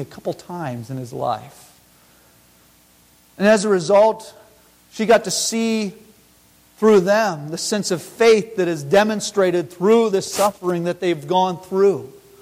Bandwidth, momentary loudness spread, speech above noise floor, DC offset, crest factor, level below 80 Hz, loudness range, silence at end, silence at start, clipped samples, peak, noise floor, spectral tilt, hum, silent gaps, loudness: 16.5 kHz; 14 LU; 35 dB; under 0.1%; 14 dB; -60 dBFS; 5 LU; 0.3 s; 0 s; under 0.1%; -4 dBFS; -53 dBFS; -4.5 dB/octave; 60 Hz at -55 dBFS; none; -19 LUFS